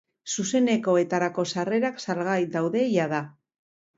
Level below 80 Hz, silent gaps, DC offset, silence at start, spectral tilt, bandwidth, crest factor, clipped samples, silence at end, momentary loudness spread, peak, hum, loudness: -72 dBFS; none; under 0.1%; 0.25 s; -5 dB/octave; 8 kHz; 16 dB; under 0.1%; 0.7 s; 7 LU; -10 dBFS; none; -25 LUFS